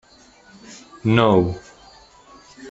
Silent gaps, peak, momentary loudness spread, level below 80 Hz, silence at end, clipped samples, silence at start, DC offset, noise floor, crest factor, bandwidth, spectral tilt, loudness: none; -2 dBFS; 26 LU; -52 dBFS; 0 s; under 0.1%; 0.7 s; under 0.1%; -50 dBFS; 20 dB; 8 kHz; -7 dB/octave; -18 LUFS